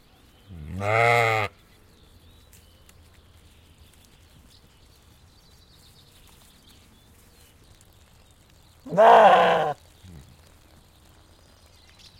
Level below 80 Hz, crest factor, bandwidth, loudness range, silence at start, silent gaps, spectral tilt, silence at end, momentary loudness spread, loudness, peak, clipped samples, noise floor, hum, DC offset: -58 dBFS; 22 dB; 16 kHz; 7 LU; 0.5 s; none; -5 dB/octave; 2.45 s; 23 LU; -19 LUFS; -4 dBFS; under 0.1%; -55 dBFS; none; under 0.1%